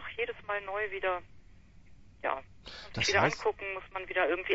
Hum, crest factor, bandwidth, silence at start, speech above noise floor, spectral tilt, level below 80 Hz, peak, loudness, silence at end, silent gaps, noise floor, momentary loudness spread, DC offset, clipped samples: none; 22 dB; 8 kHz; 0 s; 23 dB; -3.5 dB/octave; -58 dBFS; -12 dBFS; -32 LUFS; 0 s; none; -55 dBFS; 13 LU; under 0.1%; under 0.1%